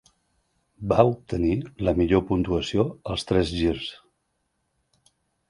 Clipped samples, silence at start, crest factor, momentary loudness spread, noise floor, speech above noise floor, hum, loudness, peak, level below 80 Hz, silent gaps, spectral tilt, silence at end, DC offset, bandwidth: under 0.1%; 0.8 s; 24 dB; 9 LU; -74 dBFS; 51 dB; none; -24 LUFS; -2 dBFS; -42 dBFS; none; -7 dB/octave; 1.55 s; under 0.1%; 11.5 kHz